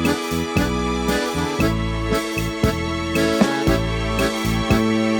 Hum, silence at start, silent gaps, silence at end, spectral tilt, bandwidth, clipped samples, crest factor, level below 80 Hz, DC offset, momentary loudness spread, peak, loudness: none; 0 s; none; 0 s; -5.5 dB/octave; over 20 kHz; under 0.1%; 18 dB; -30 dBFS; under 0.1%; 4 LU; -2 dBFS; -20 LUFS